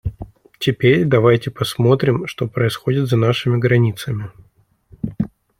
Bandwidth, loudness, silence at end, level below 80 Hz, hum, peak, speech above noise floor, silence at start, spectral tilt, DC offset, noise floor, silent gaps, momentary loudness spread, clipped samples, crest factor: 16 kHz; -17 LUFS; 0.35 s; -44 dBFS; none; -2 dBFS; 39 dB; 0.05 s; -7 dB/octave; under 0.1%; -55 dBFS; none; 16 LU; under 0.1%; 16 dB